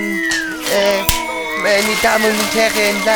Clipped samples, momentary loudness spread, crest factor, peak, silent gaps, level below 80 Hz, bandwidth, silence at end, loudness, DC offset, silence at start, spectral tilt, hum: under 0.1%; 5 LU; 14 dB; -2 dBFS; none; -36 dBFS; over 20 kHz; 0 s; -15 LUFS; 0.3%; 0 s; -2.5 dB/octave; none